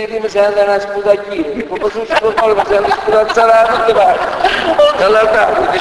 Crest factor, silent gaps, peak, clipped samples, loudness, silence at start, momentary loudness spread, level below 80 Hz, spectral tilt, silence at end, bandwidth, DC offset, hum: 12 dB; none; 0 dBFS; under 0.1%; -12 LUFS; 0 s; 8 LU; -40 dBFS; -4 dB/octave; 0 s; 11 kHz; under 0.1%; none